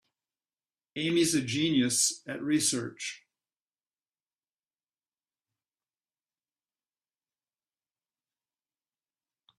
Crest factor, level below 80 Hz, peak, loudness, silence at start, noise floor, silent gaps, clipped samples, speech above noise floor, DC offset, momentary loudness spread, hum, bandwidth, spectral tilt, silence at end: 20 dB; -74 dBFS; -14 dBFS; -28 LUFS; 0.95 s; under -90 dBFS; none; under 0.1%; over 61 dB; under 0.1%; 13 LU; none; 14 kHz; -3 dB/octave; 6.4 s